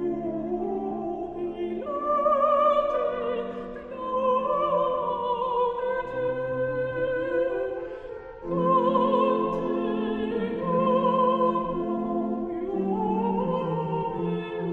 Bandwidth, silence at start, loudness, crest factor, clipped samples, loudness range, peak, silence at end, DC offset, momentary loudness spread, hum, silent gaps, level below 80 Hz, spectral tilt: 4.5 kHz; 0 s; -26 LUFS; 16 dB; under 0.1%; 3 LU; -10 dBFS; 0 s; under 0.1%; 10 LU; none; none; -52 dBFS; -9 dB/octave